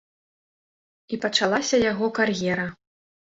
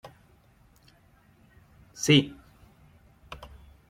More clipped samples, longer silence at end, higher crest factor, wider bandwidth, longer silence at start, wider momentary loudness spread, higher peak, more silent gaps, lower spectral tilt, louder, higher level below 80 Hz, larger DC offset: neither; about the same, 0.6 s vs 0.55 s; second, 20 dB vs 26 dB; second, 8 kHz vs 15.5 kHz; second, 1.1 s vs 2 s; second, 9 LU vs 28 LU; about the same, -6 dBFS vs -6 dBFS; neither; about the same, -3.5 dB/octave vs -4.5 dB/octave; about the same, -23 LUFS vs -24 LUFS; about the same, -58 dBFS vs -58 dBFS; neither